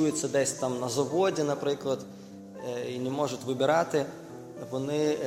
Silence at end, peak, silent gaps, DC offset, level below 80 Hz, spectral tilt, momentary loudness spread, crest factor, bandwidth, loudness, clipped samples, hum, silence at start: 0 s; -12 dBFS; none; under 0.1%; -70 dBFS; -4.5 dB/octave; 16 LU; 18 dB; 16 kHz; -29 LUFS; under 0.1%; none; 0 s